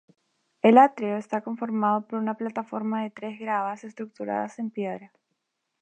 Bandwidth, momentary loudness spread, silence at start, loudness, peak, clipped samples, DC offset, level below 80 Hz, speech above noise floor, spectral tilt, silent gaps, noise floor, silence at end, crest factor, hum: 8.4 kHz; 16 LU; 0.65 s; -25 LUFS; -4 dBFS; under 0.1%; under 0.1%; -82 dBFS; 54 dB; -7 dB/octave; none; -79 dBFS; 0.75 s; 22 dB; none